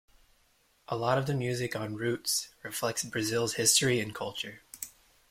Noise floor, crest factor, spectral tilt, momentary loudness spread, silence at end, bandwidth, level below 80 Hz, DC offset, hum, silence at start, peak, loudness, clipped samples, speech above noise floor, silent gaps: -68 dBFS; 24 dB; -3 dB/octave; 16 LU; 0.4 s; 16.5 kHz; -64 dBFS; under 0.1%; none; 0.9 s; -8 dBFS; -30 LUFS; under 0.1%; 37 dB; none